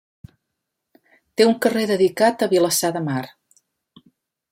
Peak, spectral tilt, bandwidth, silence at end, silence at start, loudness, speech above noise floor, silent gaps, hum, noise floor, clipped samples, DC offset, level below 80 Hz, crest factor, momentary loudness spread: -4 dBFS; -4 dB/octave; 16.5 kHz; 1.25 s; 1.4 s; -19 LUFS; 61 dB; none; none; -79 dBFS; under 0.1%; under 0.1%; -64 dBFS; 18 dB; 11 LU